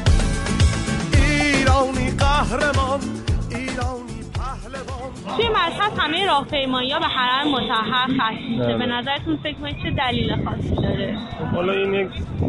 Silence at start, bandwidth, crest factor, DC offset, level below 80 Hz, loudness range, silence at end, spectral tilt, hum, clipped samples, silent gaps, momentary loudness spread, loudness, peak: 0 s; 11.5 kHz; 14 dB; under 0.1%; -28 dBFS; 4 LU; 0 s; -5 dB/octave; none; under 0.1%; none; 10 LU; -21 LUFS; -6 dBFS